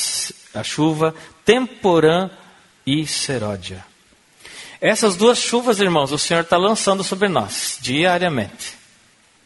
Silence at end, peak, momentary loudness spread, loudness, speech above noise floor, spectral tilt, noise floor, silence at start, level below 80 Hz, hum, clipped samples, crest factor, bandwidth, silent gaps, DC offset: 0.7 s; 0 dBFS; 15 LU; -18 LUFS; 36 dB; -3.5 dB/octave; -54 dBFS; 0 s; -56 dBFS; none; under 0.1%; 20 dB; 12 kHz; none; under 0.1%